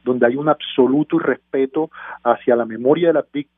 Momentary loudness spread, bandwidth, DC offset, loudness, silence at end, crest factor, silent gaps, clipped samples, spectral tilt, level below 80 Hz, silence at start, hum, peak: 5 LU; 3.8 kHz; under 0.1%; -18 LUFS; 0.15 s; 18 dB; none; under 0.1%; -11 dB/octave; -64 dBFS; 0.05 s; none; 0 dBFS